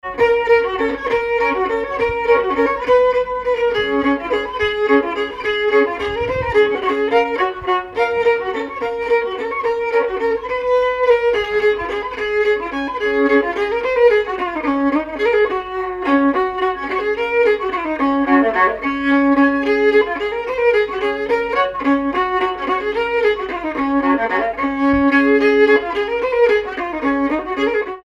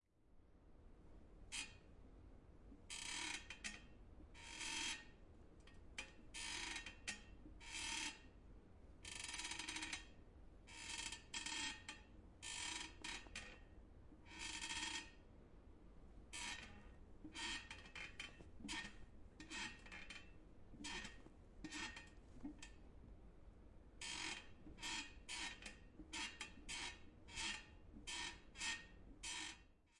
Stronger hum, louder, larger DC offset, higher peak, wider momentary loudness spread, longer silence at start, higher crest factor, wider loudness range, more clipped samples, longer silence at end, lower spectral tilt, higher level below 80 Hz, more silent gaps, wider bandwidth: neither; first, -17 LUFS vs -50 LUFS; neither; first, -2 dBFS vs -32 dBFS; second, 7 LU vs 20 LU; about the same, 0.05 s vs 0.15 s; second, 14 dB vs 22 dB; about the same, 3 LU vs 4 LU; neither; about the same, 0.05 s vs 0 s; first, -5.5 dB/octave vs -1 dB/octave; first, -44 dBFS vs -64 dBFS; neither; second, 7.6 kHz vs 12 kHz